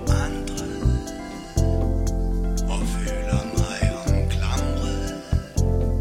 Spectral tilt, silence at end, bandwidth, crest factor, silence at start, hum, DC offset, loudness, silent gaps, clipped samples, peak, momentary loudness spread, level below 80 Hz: -6 dB/octave; 0 s; 14 kHz; 14 dB; 0 s; none; under 0.1%; -25 LUFS; none; under 0.1%; -8 dBFS; 5 LU; -26 dBFS